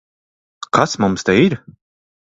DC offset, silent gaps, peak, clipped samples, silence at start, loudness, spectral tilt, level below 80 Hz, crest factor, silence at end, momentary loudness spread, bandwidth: under 0.1%; none; 0 dBFS; under 0.1%; 0.75 s; -16 LUFS; -5.5 dB/octave; -50 dBFS; 18 dB; 0.8 s; 13 LU; 8 kHz